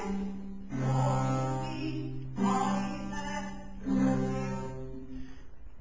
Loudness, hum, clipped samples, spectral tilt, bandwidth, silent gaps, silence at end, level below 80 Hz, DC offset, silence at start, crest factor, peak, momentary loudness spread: -33 LUFS; none; under 0.1%; -7 dB/octave; 7.8 kHz; none; 0 s; -50 dBFS; 0.7%; 0 s; 16 dB; -16 dBFS; 14 LU